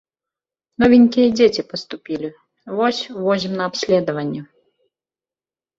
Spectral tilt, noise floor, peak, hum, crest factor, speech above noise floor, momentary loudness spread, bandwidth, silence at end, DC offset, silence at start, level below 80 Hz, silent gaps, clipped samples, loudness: -5.5 dB/octave; under -90 dBFS; -2 dBFS; none; 18 dB; over 73 dB; 16 LU; 7.6 kHz; 1.35 s; under 0.1%; 0.8 s; -54 dBFS; none; under 0.1%; -18 LUFS